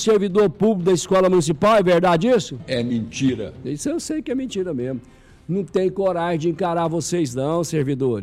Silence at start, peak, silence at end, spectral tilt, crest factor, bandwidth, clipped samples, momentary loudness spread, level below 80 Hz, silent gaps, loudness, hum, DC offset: 0 s; -10 dBFS; 0 s; -5.5 dB/octave; 10 dB; 14.5 kHz; under 0.1%; 10 LU; -50 dBFS; none; -20 LUFS; none; under 0.1%